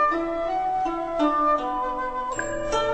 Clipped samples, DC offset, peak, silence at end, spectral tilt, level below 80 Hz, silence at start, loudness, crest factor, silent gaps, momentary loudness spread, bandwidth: under 0.1%; under 0.1%; -12 dBFS; 0 s; -4 dB/octave; -44 dBFS; 0 s; -25 LUFS; 14 dB; none; 6 LU; 9 kHz